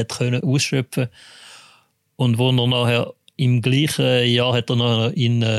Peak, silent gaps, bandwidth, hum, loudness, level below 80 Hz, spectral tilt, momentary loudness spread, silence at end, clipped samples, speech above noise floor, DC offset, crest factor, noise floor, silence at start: -6 dBFS; none; 12.5 kHz; none; -19 LUFS; -60 dBFS; -5.5 dB/octave; 6 LU; 0 s; under 0.1%; 39 dB; under 0.1%; 12 dB; -57 dBFS; 0 s